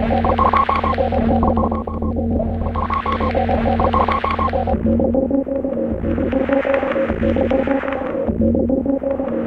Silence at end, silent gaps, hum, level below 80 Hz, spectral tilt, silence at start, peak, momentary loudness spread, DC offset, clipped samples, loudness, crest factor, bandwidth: 0 s; none; none; -28 dBFS; -9.5 dB/octave; 0 s; 0 dBFS; 5 LU; under 0.1%; under 0.1%; -18 LUFS; 16 dB; 5.6 kHz